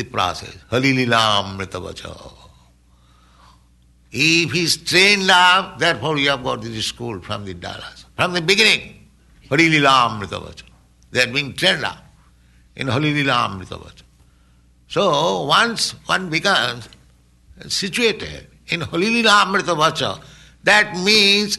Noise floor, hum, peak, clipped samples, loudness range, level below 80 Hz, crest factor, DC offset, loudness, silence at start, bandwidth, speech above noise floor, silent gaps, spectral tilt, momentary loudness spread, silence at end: -53 dBFS; 60 Hz at -50 dBFS; -2 dBFS; under 0.1%; 6 LU; -50 dBFS; 18 dB; under 0.1%; -16 LUFS; 0 s; 12 kHz; 35 dB; none; -3 dB/octave; 18 LU; 0 s